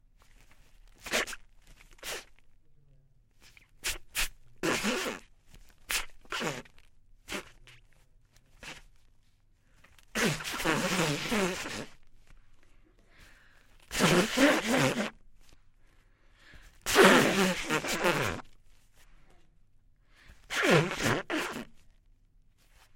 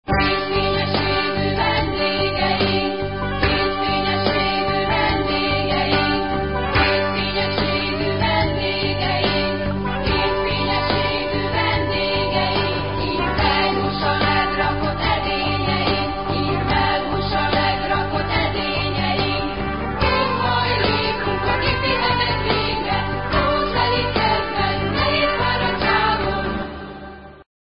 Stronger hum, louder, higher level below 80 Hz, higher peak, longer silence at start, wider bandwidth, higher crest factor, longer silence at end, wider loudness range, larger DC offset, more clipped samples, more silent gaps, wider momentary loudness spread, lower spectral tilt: neither; second, -29 LUFS vs -19 LUFS; second, -54 dBFS vs -32 dBFS; about the same, -2 dBFS vs -4 dBFS; first, 1.05 s vs 0 s; first, 16.5 kHz vs 5.4 kHz; first, 30 dB vs 16 dB; first, 1.2 s vs 0.2 s; first, 12 LU vs 1 LU; second, under 0.1% vs 1%; neither; neither; first, 19 LU vs 4 LU; second, -3.5 dB/octave vs -10.5 dB/octave